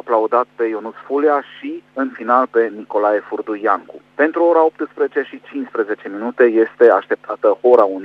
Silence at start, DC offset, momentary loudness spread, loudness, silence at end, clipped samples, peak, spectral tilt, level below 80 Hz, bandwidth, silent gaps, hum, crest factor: 0.05 s; under 0.1%; 13 LU; -17 LUFS; 0 s; under 0.1%; 0 dBFS; -7 dB/octave; -70 dBFS; 4.9 kHz; none; 50 Hz at -65 dBFS; 16 dB